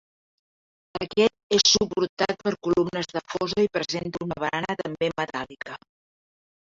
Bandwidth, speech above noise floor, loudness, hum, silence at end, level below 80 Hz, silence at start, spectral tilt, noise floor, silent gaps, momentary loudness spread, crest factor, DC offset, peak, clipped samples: 7.8 kHz; over 65 dB; -25 LUFS; none; 1 s; -58 dBFS; 0.95 s; -3.5 dB/octave; under -90 dBFS; 1.43-1.50 s, 2.09-2.17 s; 15 LU; 22 dB; under 0.1%; -4 dBFS; under 0.1%